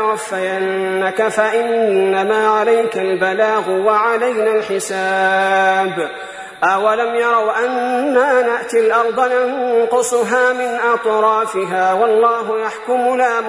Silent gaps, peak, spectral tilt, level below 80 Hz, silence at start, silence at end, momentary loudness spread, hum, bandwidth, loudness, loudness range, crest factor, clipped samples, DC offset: none; -2 dBFS; -3.5 dB/octave; -64 dBFS; 0 s; 0 s; 5 LU; none; 11 kHz; -15 LUFS; 1 LU; 14 dB; under 0.1%; under 0.1%